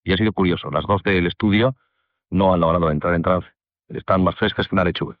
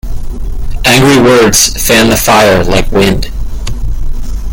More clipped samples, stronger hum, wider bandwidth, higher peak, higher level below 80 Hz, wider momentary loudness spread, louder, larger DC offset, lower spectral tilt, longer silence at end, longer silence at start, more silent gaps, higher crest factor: second, under 0.1% vs 0.4%; neither; second, 5.4 kHz vs over 20 kHz; second, -4 dBFS vs 0 dBFS; second, -42 dBFS vs -16 dBFS; second, 6 LU vs 17 LU; second, -20 LUFS vs -7 LUFS; neither; first, -9.5 dB/octave vs -3.5 dB/octave; about the same, 0.05 s vs 0 s; about the same, 0.05 s vs 0.05 s; neither; first, 16 dB vs 8 dB